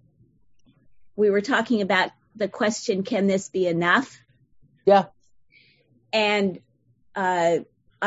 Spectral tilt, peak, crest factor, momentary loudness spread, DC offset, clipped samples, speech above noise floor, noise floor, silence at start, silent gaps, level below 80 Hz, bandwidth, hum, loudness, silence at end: -4.5 dB/octave; -4 dBFS; 20 dB; 11 LU; under 0.1%; under 0.1%; 39 dB; -61 dBFS; 1.15 s; none; -68 dBFS; 8 kHz; none; -23 LUFS; 0 s